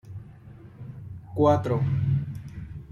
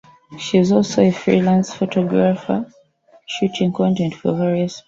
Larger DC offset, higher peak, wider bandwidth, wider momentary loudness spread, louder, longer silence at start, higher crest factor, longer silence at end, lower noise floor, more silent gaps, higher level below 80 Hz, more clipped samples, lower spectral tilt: neither; second, -8 dBFS vs -2 dBFS; about the same, 7 kHz vs 7.6 kHz; first, 23 LU vs 8 LU; second, -25 LUFS vs -18 LUFS; second, 0.05 s vs 0.3 s; about the same, 20 dB vs 16 dB; about the same, 0.05 s vs 0.05 s; about the same, -46 dBFS vs -49 dBFS; neither; first, -50 dBFS vs -56 dBFS; neither; first, -9.5 dB/octave vs -6.5 dB/octave